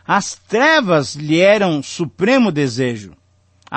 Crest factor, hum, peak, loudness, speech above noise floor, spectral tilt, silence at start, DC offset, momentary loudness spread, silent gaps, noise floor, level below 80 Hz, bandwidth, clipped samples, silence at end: 14 dB; none; -2 dBFS; -15 LUFS; 36 dB; -5 dB/octave; 0.1 s; under 0.1%; 9 LU; none; -51 dBFS; -58 dBFS; 8.8 kHz; under 0.1%; 0 s